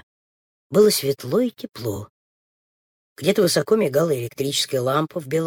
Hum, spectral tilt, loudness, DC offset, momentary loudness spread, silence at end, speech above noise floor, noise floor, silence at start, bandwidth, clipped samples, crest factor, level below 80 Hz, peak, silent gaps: none; -4.5 dB/octave; -21 LUFS; under 0.1%; 12 LU; 0 s; over 70 dB; under -90 dBFS; 0.7 s; 19.5 kHz; under 0.1%; 18 dB; -62 dBFS; -4 dBFS; 2.09-3.16 s